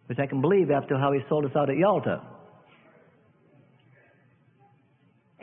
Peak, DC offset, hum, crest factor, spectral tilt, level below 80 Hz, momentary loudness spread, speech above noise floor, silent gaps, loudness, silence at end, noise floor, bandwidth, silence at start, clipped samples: -10 dBFS; under 0.1%; none; 18 dB; -11.5 dB/octave; -68 dBFS; 6 LU; 39 dB; none; -25 LUFS; 3.05 s; -64 dBFS; 3.8 kHz; 0.1 s; under 0.1%